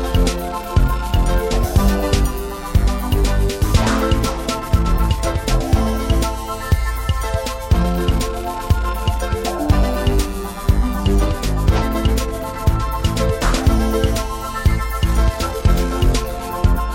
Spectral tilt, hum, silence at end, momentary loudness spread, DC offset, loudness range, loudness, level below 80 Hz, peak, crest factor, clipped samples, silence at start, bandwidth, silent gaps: -5.5 dB/octave; none; 0 s; 5 LU; under 0.1%; 1 LU; -19 LUFS; -20 dBFS; 0 dBFS; 16 dB; under 0.1%; 0 s; 16.5 kHz; none